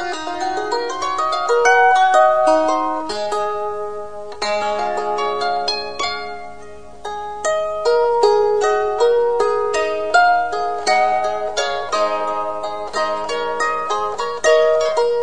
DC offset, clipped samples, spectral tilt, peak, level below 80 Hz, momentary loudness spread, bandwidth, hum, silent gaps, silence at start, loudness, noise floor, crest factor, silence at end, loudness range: 2%; under 0.1%; -2 dB/octave; -2 dBFS; -52 dBFS; 11 LU; 10.5 kHz; none; none; 0 s; -18 LUFS; -38 dBFS; 16 dB; 0 s; 6 LU